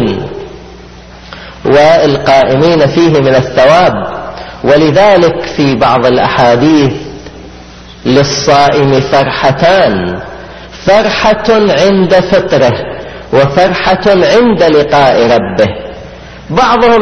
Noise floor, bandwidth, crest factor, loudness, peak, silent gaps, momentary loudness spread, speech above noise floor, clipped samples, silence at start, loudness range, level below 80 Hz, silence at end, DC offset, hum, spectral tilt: -31 dBFS; 10.5 kHz; 8 dB; -8 LUFS; 0 dBFS; none; 17 LU; 24 dB; 0.7%; 0 s; 2 LU; -34 dBFS; 0 s; under 0.1%; none; -5.5 dB/octave